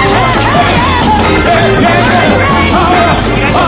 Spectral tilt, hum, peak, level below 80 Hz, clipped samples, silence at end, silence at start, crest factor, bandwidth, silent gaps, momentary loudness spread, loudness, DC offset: -9.5 dB/octave; none; 0 dBFS; -20 dBFS; 0.6%; 0 s; 0 s; 8 dB; 4 kHz; none; 1 LU; -8 LUFS; under 0.1%